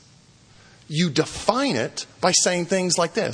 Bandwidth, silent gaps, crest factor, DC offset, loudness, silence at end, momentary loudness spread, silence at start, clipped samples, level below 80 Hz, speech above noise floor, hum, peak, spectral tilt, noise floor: 10.5 kHz; none; 22 dB; under 0.1%; -22 LUFS; 0 s; 7 LU; 0.9 s; under 0.1%; -56 dBFS; 31 dB; none; 0 dBFS; -3.5 dB/octave; -53 dBFS